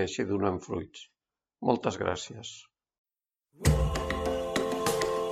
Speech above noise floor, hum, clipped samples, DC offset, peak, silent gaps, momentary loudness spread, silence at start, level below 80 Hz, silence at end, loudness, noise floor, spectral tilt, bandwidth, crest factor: 54 dB; none; under 0.1%; under 0.1%; -10 dBFS; 2.98-3.04 s; 15 LU; 0 s; -40 dBFS; 0 s; -30 LUFS; -84 dBFS; -5 dB/octave; 16 kHz; 22 dB